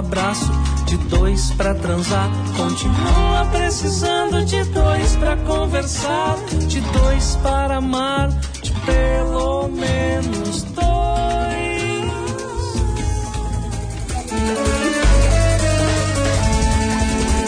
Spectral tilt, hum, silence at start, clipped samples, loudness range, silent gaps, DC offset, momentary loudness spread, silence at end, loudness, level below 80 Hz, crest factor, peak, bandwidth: -5 dB/octave; none; 0 s; under 0.1%; 3 LU; none; under 0.1%; 7 LU; 0 s; -19 LUFS; -20 dBFS; 12 dB; -4 dBFS; 10.5 kHz